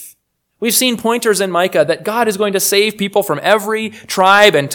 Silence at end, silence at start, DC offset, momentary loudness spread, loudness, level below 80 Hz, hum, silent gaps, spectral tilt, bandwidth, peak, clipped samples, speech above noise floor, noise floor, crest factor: 0 s; 0 s; under 0.1%; 8 LU; -13 LUFS; -62 dBFS; none; none; -2.5 dB/octave; 19.5 kHz; 0 dBFS; 0.3%; 41 dB; -54 dBFS; 14 dB